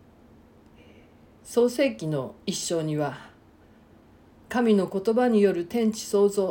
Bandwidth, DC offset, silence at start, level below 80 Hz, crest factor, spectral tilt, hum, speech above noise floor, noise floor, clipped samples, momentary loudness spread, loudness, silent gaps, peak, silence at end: 17 kHz; under 0.1%; 1.45 s; -62 dBFS; 16 dB; -5.5 dB/octave; none; 31 dB; -55 dBFS; under 0.1%; 9 LU; -25 LUFS; none; -10 dBFS; 0 s